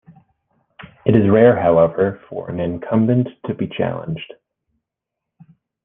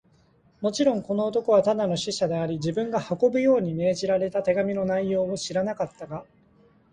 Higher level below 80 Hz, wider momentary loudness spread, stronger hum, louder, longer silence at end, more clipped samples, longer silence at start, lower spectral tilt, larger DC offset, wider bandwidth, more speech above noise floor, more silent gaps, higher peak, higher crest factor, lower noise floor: first, -54 dBFS vs -60 dBFS; first, 16 LU vs 8 LU; neither; first, -17 LUFS vs -25 LUFS; first, 1.6 s vs 0.7 s; neither; first, 0.8 s vs 0.6 s; first, -11 dB/octave vs -5.5 dB/octave; neither; second, 3.8 kHz vs 10 kHz; first, 66 dB vs 36 dB; neither; first, 0 dBFS vs -8 dBFS; about the same, 18 dB vs 16 dB; first, -82 dBFS vs -60 dBFS